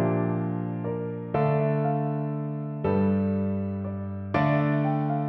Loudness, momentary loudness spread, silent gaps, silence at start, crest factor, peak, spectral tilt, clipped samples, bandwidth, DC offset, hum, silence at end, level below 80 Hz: -27 LUFS; 8 LU; none; 0 s; 14 dB; -12 dBFS; -11 dB/octave; under 0.1%; 4.8 kHz; under 0.1%; none; 0 s; -58 dBFS